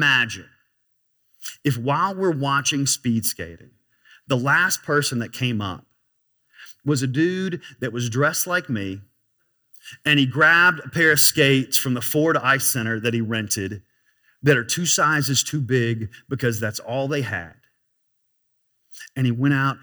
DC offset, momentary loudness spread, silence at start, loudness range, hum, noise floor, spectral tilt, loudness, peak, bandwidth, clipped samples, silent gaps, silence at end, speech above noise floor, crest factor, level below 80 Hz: under 0.1%; 15 LU; 0 s; 9 LU; none; -64 dBFS; -3.5 dB/octave; -20 LUFS; -2 dBFS; over 20 kHz; under 0.1%; none; 0.05 s; 43 dB; 20 dB; -64 dBFS